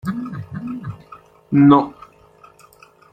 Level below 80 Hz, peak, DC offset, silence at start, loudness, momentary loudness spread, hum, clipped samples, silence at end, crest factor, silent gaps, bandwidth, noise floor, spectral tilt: -56 dBFS; 0 dBFS; under 0.1%; 0.05 s; -17 LUFS; 20 LU; none; under 0.1%; 1.2 s; 20 dB; none; 4.9 kHz; -49 dBFS; -9 dB/octave